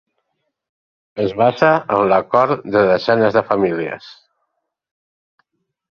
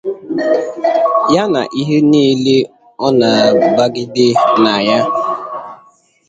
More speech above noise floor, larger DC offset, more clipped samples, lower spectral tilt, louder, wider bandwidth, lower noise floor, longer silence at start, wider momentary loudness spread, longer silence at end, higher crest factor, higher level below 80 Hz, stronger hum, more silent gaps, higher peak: first, 58 dB vs 36 dB; neither; neither; first, -7.5 dB/octave vs -5.5 dB/octave; second, -16 LUFS vs -13 LUFS; second, 6.8 kHz vs 9 kHz; first, -73 dBFS vs -48 dBFS; first, 1.15 s vs 0.05 s; about the same, 10 LU vs 10 LU; first, 1.8 s vs 0.55 s; about the same, 16 dB vs 12 dB; about the same, -56 dBFS vs -56 dBFS; neither; neither; about the same, -2 dBFS vs 0 dBFS